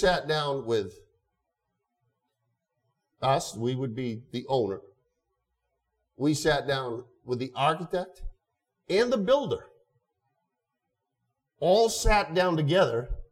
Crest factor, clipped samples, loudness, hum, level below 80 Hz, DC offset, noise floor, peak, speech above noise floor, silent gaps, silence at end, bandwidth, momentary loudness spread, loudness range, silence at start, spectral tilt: 20 dB; under 0.1%; -27 LUFS; none; -42 dBFS; under 0.1%; -83 dBFS; -10 dBFS; 57 dB; none; 0.05 s; 16 kHz; 11 LU; 6 LU; 0 s; -5 dB/octave